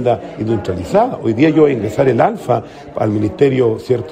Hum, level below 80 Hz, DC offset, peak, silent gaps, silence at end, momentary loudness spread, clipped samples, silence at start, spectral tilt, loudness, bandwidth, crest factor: none; -48 dBFS; under 0.1%; 0 dBFS; none; 0 s; 7 LU; under 0.1%; 0 s; -8 dB/octave; -15 LUFS; 15 kHz; 14 dB